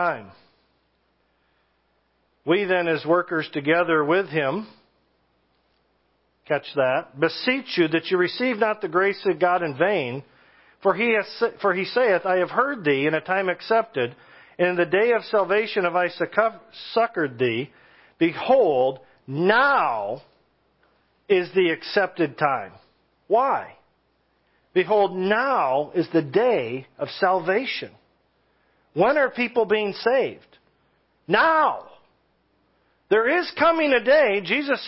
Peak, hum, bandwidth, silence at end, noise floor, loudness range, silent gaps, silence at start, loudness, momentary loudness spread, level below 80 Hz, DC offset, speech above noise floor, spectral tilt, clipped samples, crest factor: -2 dBFS; none; 5.8 kHz; 0 s; -68 dBFS; 3 LU; none; 0 s; -22 LUFS; 10 LU; -70 dBFS; under 0.1%; 46 dB; -9.5 dB/octave; under 0.1%; 20 dB